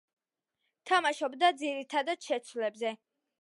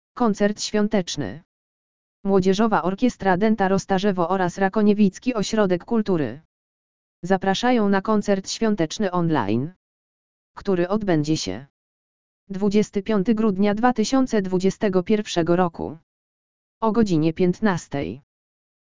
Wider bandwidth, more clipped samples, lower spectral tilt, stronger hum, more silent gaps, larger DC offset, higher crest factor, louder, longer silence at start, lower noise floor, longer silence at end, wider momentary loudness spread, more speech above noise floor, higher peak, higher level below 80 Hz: first, 11.5 kHz vs 7.6 kHz; neither; second, -1.5 dB/octave vs -6 dB/octave; neither; second, none vs 1.45-2.23 s, 6.45-7.22 s, 9.76-10.55 s, 11.70-12.47 s, 16.03-16.81 s; second, under 0.1% vs 2%; about the same, 20 dB vs 20 dB; second, -31 LUFS vs -22 LUFS; first, 0.85 s vs 0.15 s; second, -85 dBFS vs under -90 dBFS; second, 0.45 s vs 0.7 s; about the same, 9 LU vs 10 LU; second, 54 dB vs over 69 dB; second, -12 dBFS vs -2 dBFS; second, under -90 dBFS vs -50 dBFS